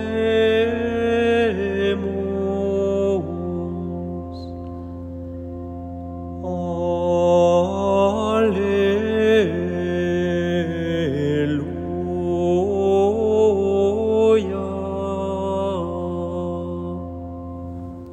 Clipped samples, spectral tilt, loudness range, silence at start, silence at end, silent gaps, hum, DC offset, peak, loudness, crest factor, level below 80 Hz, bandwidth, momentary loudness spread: under 0.1%; -7 dB/octave; 8 LU; 0 s; 0 s; none; none; under 0.1%; -6 dBFS; -21 LUFS; 14 dB; -50 dBFS; 9.4 kHz; 15 LU